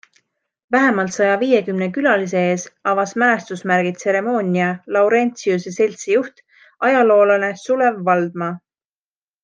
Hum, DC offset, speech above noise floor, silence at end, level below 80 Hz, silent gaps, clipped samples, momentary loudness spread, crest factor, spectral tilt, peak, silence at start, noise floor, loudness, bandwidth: none; under 0.1%; over 73 dB; 0.85 s; -70 dBFS; none; under 0.1%; 6 LU; 16 dB; -5.5 dB/octave; -2 dBFS; 0.7 s; under -90 dBFS; -17 LUFS; 9.8 kHz